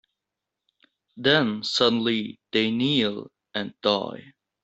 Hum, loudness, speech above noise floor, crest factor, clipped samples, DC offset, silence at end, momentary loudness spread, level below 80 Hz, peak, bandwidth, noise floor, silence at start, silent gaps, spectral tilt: none; -24 LUFS; 61 dB; 22 dB; under 0.1%; under 0.1%; 0.35 s; 13 LU; -66 dBFS; -4 dBFS; 8.2 kHz; -86 dBFS; 1.15 s; none; -5 dB/octave